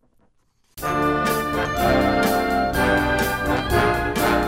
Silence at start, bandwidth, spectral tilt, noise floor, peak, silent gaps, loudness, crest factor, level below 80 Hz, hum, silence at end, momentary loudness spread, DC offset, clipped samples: 0.75 s; 16.5 kHz; -5 dB/octave; -63 dBFS; -4 dBFS; none; -20 LUFS; 16 dB; -34 dBFS; none; 0 s; 4 LU; under 0.1%; under 0.1%